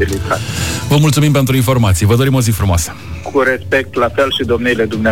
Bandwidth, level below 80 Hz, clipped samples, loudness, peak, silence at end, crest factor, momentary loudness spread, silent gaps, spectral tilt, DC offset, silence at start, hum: 17.5 kHz; -30 dBFS; under 0.1%; -13 LUFS; -2 dBFS; 0 s; 10 dB; 6 LU; none; -5.5 dB/octave; 1%; 0 s; none